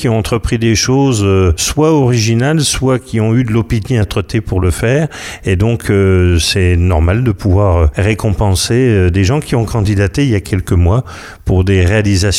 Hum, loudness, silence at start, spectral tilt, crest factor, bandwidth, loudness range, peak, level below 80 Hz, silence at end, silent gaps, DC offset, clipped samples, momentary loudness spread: none; -12 LUFS; 0 s; -5.5 dB/octave; 12 dB; 15 kHz; 2 LU; 0 dBFS; -24 dBFS; 0 s; none; under 0.1%; under 0.1%; 5 LU